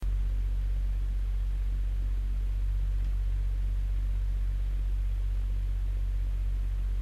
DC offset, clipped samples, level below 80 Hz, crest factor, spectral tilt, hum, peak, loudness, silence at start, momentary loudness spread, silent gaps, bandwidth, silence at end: under 0.1%; under 0.1%; -28 dBFS; 6 dB; -7 dB/octave; none; -22 dBFS; -33 LUFS; 0 s; 1 LU; none; 4 kHz; 0 s